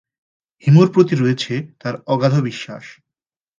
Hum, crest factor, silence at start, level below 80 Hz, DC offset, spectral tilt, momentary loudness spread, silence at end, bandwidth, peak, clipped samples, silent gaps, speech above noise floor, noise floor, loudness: none; 18 dB; 0.65 s; -62 dBFS; under 0.1%; -7.5 dB/octave; 17 LU; 0.7 s; 7.4 kHz; 0 dBFS; under 0.1%; none; 70 dB; -87 dBFS; -17 LUFS